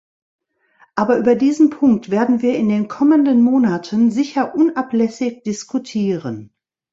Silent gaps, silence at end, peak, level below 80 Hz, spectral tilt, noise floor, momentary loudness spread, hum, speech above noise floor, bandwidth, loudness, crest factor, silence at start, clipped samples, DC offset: none; 0.45 s; -2 dBFS; -60 dBFS; -6.5 dB/octave; -55 dBFS; 10 LU; none; 39 dB; 7.8 kHz; -17 LUFS; 14 dB; 0.95 s; under 0.1%; under 0.1%